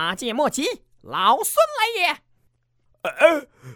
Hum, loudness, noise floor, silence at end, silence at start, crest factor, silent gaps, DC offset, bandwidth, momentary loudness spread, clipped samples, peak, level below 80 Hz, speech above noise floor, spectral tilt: none; -21 LUFS; -65 dBFS; 0 s; 0 s; 22 dB; none; under 0.1%; 19 kHz; 13 LU; under 0.1%; 0 dBFS; -62 dBFS; 44 dB; -2 dB/octave